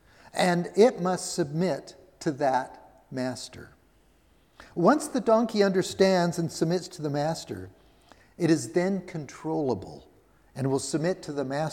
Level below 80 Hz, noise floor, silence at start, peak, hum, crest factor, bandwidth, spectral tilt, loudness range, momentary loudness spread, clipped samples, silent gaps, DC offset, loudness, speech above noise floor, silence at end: -64 dBFS; -62 dBFS; 0.25 s; -6 dBFS; none; 20 dB; 16.5 kHz; -5.5 dB/octave; 5 LU; 16 LU; under 0.1%; none; under 0.1%; -27 LUFS; 36 dB; 0 s